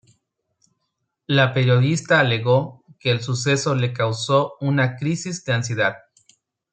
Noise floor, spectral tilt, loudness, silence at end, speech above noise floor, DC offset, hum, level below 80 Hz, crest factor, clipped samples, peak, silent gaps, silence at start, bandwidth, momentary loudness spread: -76 dBFS; -5.5 dB/octave; -20 LUFS; 0.75 s; 56 dB; under 0.1%; none; -62 dBFS; 20 dB; under 0.1%; -2 dBFS; none; 1.3 s; 9 kHz; 7 LU